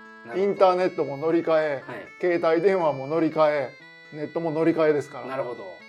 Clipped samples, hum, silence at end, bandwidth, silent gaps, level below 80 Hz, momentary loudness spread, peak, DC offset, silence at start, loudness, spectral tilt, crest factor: under 0.1%; none; 0 s; 10 kHz; none; -78 dBFS; 13 LU; -6 dBFS; under 0.1%; 0 s; -24 LUFS; -7 dB/octave; 18 dB